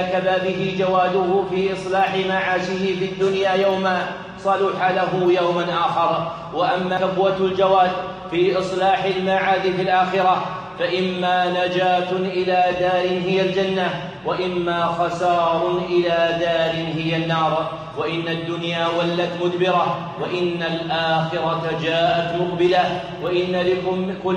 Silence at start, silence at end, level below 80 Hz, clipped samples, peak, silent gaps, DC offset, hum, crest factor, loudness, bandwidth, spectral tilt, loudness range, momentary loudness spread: 0 s; 0 s; -54 dBFS; under 0.1%; -4 dBFS; none; under 0.1%; none; 14 dB; -20 LUFS; 9.6 kHz; -6 dB/octave; 2 LU; 6 LU